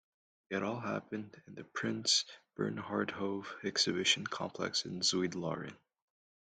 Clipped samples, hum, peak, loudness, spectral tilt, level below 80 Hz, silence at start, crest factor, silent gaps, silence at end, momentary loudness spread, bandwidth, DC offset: under 0.1%; none; -14 dBFS; -35 LUFS; -3 dB/octave; -76 dBFS; 0.5 s; 24 dB; none; 0.75 s; 14 LU; 11.5 kHz; under 0.1%